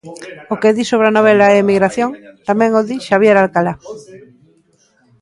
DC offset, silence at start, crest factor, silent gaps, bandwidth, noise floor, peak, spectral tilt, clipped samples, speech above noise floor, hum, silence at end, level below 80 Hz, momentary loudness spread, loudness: under 0.1%; 0.05 s; 14 dB; none; 11.5 kHz; -55 dBFS; 0 dBFS; -6 dB/octave; under 0.1%; 42 dB; none; 1.05 s; -56 dBFS; 20 LU; -13 LUFS